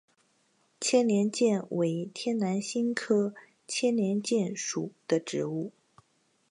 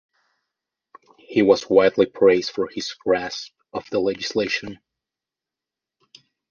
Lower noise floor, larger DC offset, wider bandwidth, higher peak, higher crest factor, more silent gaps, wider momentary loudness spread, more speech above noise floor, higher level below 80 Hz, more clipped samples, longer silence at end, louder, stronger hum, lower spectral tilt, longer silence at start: second, -71 dBFS vs -88 dBFS; neither; first, 11 kHz vs 7.2 kHz; second, -12 dBFS vs -2 dBFS; about the same, 18 dB vs 20 dB; neither; second, 9 LU vs 15 LU; second, 42 dB vs 68 dB; second, -80 dBFS vs -60 dBFS; neither; second, 0.8 s vs 1.75 s; second, -29 LUFS vs -20 LUFS; neither; about the same, -5 dB/octave vs -4.5 dB/octave; second, 0.8 s vs 1.3 s